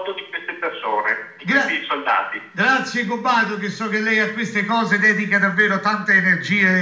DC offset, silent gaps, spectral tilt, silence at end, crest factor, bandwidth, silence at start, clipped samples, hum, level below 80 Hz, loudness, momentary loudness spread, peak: under 0.1%; none; -5 dB/octave; 0 s; 16 dB; 8 kHz; 0 s; under 0.1%; none; -74 dBFS; -18 LUFS; 10 LU; -4 dBFS